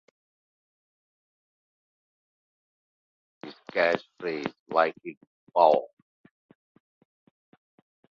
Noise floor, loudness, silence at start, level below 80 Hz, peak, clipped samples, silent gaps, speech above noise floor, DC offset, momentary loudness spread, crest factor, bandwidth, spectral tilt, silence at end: under -90 dBFS; -26 LUFS; 3.45 s; -80 dBFS; -6 dBFS; under 0.1%; 4.59-4.66 s, 5.17-5.21 s, 5.27-5.47 s; over 64 dB; under 0.1%; 24 LU; 26 dB; 7 kHz; -5.5 dB/octave; 2.25 s